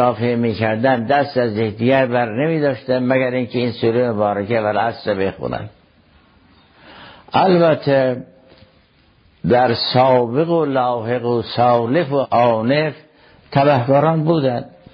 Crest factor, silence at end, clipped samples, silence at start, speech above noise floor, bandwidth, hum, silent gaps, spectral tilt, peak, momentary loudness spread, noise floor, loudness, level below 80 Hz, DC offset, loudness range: 16 dB; 0.25 s; under 0.1%; 0 s; 38 dB; 5.8 kHz; none; none; -9.5 dB/octave; -2 dBFS; 7 LU; -54 dBFS; -17 LUFS; -52 dBFS; under 0.1%; 4 LU